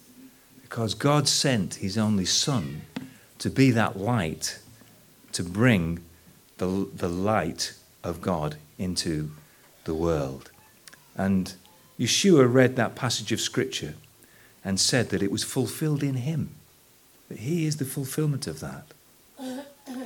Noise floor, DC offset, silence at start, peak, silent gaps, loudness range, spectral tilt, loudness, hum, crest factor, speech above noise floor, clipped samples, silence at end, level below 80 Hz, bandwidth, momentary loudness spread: -57 dBFS; under 0.1%; 0.2 s; -4 dBFS; none; 7 LU; -4.5 dB/octave; -26 LUFS; none; 22 dB; 32 dB; under 0.1%; 0 s; -54 dBFS; 19 kHz; 17 LU